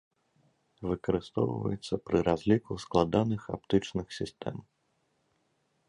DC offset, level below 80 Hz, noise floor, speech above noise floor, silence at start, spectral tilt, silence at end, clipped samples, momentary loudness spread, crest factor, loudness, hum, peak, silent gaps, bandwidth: under 0.1%; -54 dBFS; -75 dBFS; 45 dB; 0.8 s; -7 dB/octave; 1.25 s; under 0.1%; 11 LU; 22 dB; -31 LUFS; none; -10 dBFS; none; 11 kHz